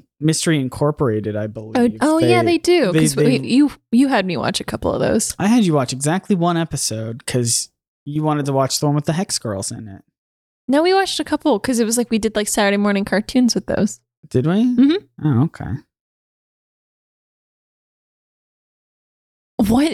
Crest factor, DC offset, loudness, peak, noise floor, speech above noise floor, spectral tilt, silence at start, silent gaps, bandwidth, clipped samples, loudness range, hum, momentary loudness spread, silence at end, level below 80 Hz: 16 dB; under 0.1%; -18 LUFS; -2 dBFS; under -90 dBFS; over 73 dB; -5 dB/octave; 0.2 s; 7.88-8.06 s, 10.18-10.68 s, 14.17-14.23 s, 16.00-19.58 s; 15.5 kHz; under 0.1%; 5 LU; none; 10 LU; 0 s; -48 dBFS